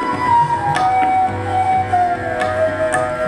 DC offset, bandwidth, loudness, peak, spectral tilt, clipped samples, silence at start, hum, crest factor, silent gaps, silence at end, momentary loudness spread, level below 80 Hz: under 0.1%; 11.5 kHz; -16 LUFS; -2 dBFS; -5.5 dB/octave; under 0.1%; 0 s; none; 14 dB; none; 0 s; 4 LU; -44 dBFS